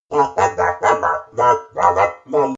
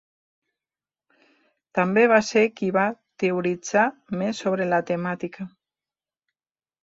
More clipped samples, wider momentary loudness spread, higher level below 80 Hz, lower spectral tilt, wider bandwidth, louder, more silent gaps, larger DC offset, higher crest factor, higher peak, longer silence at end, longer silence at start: neither; second, 3 LU vs 12 LU; first, -52 dBFS vs -68 dBFS; about the same, -4.5 dB/octave vs -5.5 dB/octave; about the same, 8 kHz vs 8 kHz; first, -17 LUFS vs -23 LUFS; neither; neither; second, 16 dB vs 22 dB; first, 0 dBFS vs -4 dBFS; second, 0 s vs 1.35 s; second, 0.1 s vs 1.75 s